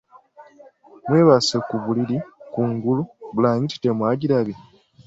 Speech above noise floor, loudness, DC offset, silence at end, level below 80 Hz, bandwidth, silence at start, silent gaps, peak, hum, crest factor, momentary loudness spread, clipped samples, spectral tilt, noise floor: 29 dB; -21 LUFS; under 0.1%; 0.45 s; -60 dBFS; 8 kHz; 0.4 s; none; -4 dBFS; none; 18 dB; 13 LU; under 0.1%; -6.5 dB/octave; -49 dBFS